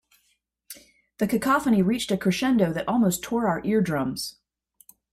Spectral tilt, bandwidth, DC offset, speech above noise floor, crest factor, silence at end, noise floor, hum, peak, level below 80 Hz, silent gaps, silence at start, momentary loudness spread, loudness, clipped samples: -5.5 dB/octave; 16 kHz; under 0.1%; 48 dB; 16 dB; 0.8 s; -71 dBFS; none; -8 dBFS; -56 dBFS; none; 0.7 s; 16 LU; -24 LUFS; under 0.1%